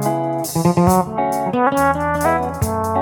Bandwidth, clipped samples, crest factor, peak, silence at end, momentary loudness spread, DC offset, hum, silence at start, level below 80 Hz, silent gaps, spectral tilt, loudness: 19.5 kHz; under 0.1%; 16 dB; -2 dBFS; 0 s; 6 LU; under 0.1%; none; 0 s; -38 dBFS; none; -6 dB/octave; -18 LUFS